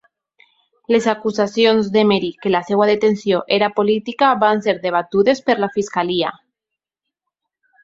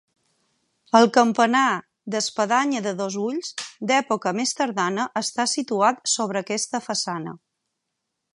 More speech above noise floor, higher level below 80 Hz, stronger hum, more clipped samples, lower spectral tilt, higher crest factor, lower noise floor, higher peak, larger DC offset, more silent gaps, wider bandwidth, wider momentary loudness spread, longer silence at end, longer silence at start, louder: first, 67 dB vs 57 dB; first, -60 dBFS vs -76 dBFS; neither; neither; first, -5.5 dB/octave vs -3 dB/octave; about the same, 18 dB vs 22 dB; first, -84 dBFS vs -80 dBFS; about the same, 0 dBFS vs -2 dBFS; neither; neither; second, 8 kHz vs 11.5 kHz; second, 5 LU vs 11 LU; first, 1.5 s vs 1 s; about the same, 0.9 s vs 0.95 s; first, -17 LUFS vs -22 LUFS